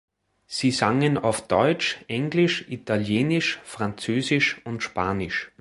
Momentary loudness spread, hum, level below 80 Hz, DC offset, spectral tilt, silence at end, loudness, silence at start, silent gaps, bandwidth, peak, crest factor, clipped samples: 8 LU; none; -54 dBFS; under 0.1%; -5 dB/octave; 0.15 s; -24 LUFS; 0.5 s; none; 11.5 kHz; -4 dBFS; 20 dB; under 0.1%